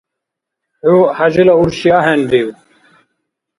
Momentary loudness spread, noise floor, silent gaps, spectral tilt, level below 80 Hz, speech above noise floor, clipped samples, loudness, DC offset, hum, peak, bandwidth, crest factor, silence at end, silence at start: 6 LU; -79 dBFS; none; -6.5 dB/octave; -48 dBFS; 68 dB; under 0.1%; -11 LUFS; under 0.1%; none; 0 dBFS; 11 kHz; 14 dB; 1.05 s; 0.85 s